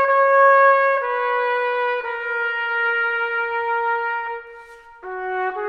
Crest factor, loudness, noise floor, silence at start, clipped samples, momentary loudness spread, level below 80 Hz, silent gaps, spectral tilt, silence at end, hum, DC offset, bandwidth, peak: 16 dB; -19 LUFS; -42 dBFS; 0 s; under 0.1%; 14 LU; -60 dBFS; none; -3 dB/octave; 0 s; none; under 0.1%; 5.8 kHz; -4 dBFS